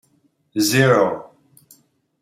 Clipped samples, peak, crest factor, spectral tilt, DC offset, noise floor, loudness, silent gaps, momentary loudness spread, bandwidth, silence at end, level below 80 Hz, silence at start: under 0.1%; -2 dBFS; 18 dB; -4.5 dB/octave; under 0.1%; -63 dBFS; -17 LUFS; none; 15 LU; 16.5 kHz; 0.95 s; -62 dBFS; 0.55 s